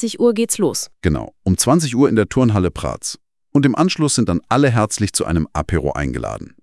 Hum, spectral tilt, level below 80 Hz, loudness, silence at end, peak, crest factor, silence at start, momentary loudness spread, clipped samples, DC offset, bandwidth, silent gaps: none; -5 dB/octave; -38 dBFS; -17 LUFS; 0.2 s; 0 dBFS; 18 dB; 0 s; 9 LU; under 0.1%; under 0.1%; 12 kHz; none